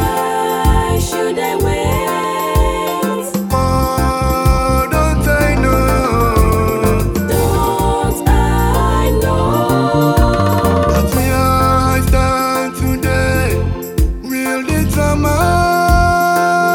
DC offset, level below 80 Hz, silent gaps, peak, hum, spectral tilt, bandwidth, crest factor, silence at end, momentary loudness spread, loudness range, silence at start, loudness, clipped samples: under 0.1%; -20 dBFS; none; 0 dBFS; none; -6 dB/octave; over 20 kHz; 12 dB; 0 s; 5 LU; 3 LU; 0 s; -14 LUFS; under 0.1%